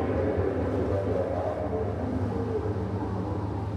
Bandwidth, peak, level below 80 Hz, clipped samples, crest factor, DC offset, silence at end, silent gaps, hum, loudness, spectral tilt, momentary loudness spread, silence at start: 8.6 kHz; -14 dBFS; -42 dBFS; under 0.1%; 14 dB; under 0.1%; 0 s; none; none; -29 LUFS; -9.5 dB/octave; 4 LU; 0 s